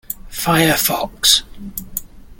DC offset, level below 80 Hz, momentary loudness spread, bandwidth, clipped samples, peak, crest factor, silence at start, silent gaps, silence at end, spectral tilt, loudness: under 0.1%; -40 dBFS; 16 LU; 17 kHz; under 0.1%; 0 dBFS; 18 dB; 0.1 s; none; 0.05 s; -2.5 dB/octave; -15 LUFS